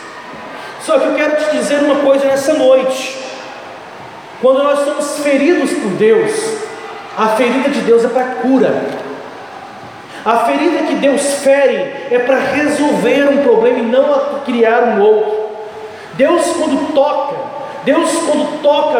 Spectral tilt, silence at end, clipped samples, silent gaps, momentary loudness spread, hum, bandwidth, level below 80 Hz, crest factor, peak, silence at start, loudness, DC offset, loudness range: -4 dB/octave; 0 s; under 0.1%; none; 17 LU; none; 15.5 kHz; -62 dBFS; 14 dB; 0 dBFS; 0 s; -13 LUFS; under 0.1%; 3 LU